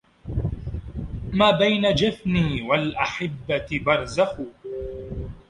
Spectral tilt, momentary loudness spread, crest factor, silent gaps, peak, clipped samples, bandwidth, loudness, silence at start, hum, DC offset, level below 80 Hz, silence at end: -6 dB/octave; 15 LU; 20 dB; none; -4 dBFS; under 0.1%; 11.5 kHz; -23 LUFS; 0.25 s; none; under 0.1%; -38 dBFS; 0.1 s